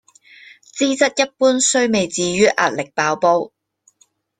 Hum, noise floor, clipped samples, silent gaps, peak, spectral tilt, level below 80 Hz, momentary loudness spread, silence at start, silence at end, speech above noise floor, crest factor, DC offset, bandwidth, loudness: none; -59 dBFS; under 0.1%; none; -2 dBFS; -3 dB/octave; -60 dBFS; 6 LU; 0.75 s; 0.9 s; 43 dB; 18 dB; under 0.1%; 10 kHz; -17 LUFS